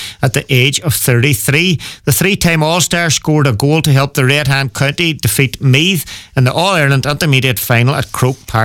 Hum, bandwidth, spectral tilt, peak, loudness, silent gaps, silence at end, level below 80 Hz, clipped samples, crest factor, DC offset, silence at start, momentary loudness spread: none; 19 kHz; -4.5 dB/octave; 0 dBFS; -12 LUFS; none; 0 s; -38 dBFS; under 0.1%; 12 dB; under 0.1%; 0 s; 4 LU